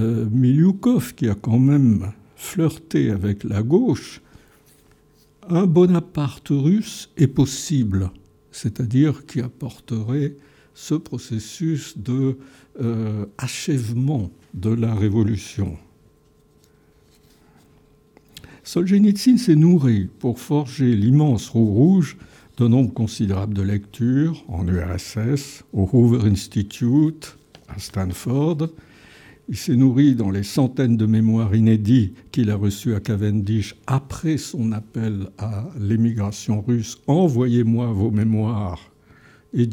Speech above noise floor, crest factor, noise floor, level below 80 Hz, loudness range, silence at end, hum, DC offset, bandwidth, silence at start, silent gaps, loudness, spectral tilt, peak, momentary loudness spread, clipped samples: 37 dB; 16 dB; -56 dBFS; -52 dBFS; 7 LU; 0 s; none; under 0.1%; 17 kHz; 0 s; none; -20 LUFS; -7.5 dB/octave; -4 dBFS; 13 LU; under 0.1%